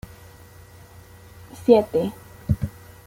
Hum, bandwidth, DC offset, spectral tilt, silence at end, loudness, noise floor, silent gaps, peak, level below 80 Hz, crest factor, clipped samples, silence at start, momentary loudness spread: none; 16.5 kHz; under 0.1%; -8 dB/octave; 0.35 s; -22 LUFS; -46 dBFS; none; -2 dBFS; -44 dBFS; 22 dB; under 0.1%; 1.6 s; 22 LU